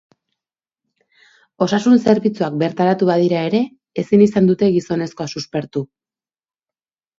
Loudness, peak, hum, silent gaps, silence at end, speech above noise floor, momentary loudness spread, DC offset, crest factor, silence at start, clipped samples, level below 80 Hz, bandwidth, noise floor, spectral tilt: -17 LUFS; 0 dBFS; none; none; 1.35 s; over 74 dB; 12 LU; under 0.1%; 18 dB; 1.6 s; under 0.1%; -58 dBFS; 7.8 kHz; under -90 dBFS; -7 dB/octave